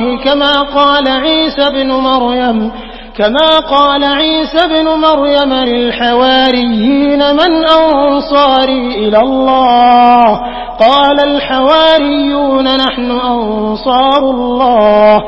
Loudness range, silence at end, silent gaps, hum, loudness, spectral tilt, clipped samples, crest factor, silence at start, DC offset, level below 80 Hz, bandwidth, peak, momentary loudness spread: 2 LU; 0 s; none; none; -9 LUFS; -6 dB/octave; 0.3%; 8 dB; 0 s; under 0.1%; -34 dBFS; 8 kHz; 0 dBFS; 6 LU